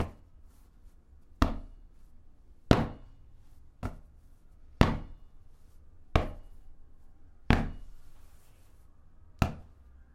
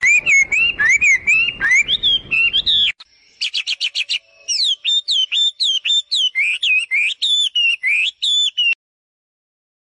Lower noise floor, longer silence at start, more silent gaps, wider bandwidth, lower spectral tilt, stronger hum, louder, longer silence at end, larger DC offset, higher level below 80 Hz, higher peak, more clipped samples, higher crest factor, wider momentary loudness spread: first, -55 dBFS vs -47 dBFS; about the same, 0 s vs 0 s; neither; first, 16.5 kHz vs 10.5 kHz; first, -7 dB/octave vs 2.5 dB/octave; neither; second, -32 LUFS vs -14 LUFS; second, 0.1 s vs 1.1 s; neither; first, -40 dBFS vs -52 dBFS; first, 0 dBFS vs -8 dBFS; neither; first, 34 dB vs 10 dB; first, 25 LU vs 8 LU